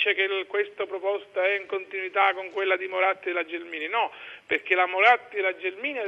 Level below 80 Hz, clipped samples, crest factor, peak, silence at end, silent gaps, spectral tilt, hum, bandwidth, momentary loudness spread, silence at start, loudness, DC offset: -80 dBFS; under 0.1%; 20 dB; -6 dBFS; 0 s; none; -3.5 dB/octave; none; 7.4 kHz; 11 LU; 0 s; -25 LUFS; under 0.1%